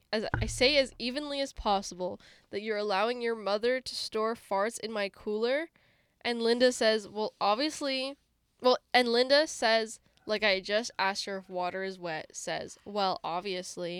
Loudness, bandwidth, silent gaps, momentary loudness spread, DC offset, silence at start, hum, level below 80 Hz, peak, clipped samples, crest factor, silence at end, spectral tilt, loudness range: -30 LUFS; 15 kHz; none; 12 LU; under 0.1%; 0.1 s; none; -54 dBFS; -10 dBFS; under 0.1%; 20 dB; 0 s; -3 dB/octave; 5 LU